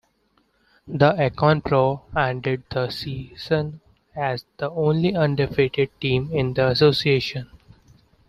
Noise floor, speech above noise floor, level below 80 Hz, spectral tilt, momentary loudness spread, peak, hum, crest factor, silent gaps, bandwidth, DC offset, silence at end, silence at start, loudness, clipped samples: -65 dBFS; 44 dB; -50 dBFS; -7.5 dB/octave; 12 LU; -2 dBFS; none; 20 dB; none; 13.5 kHz; under 0.1%; 0.7 s; 0.85 s; -22 LUFS; under 0.1%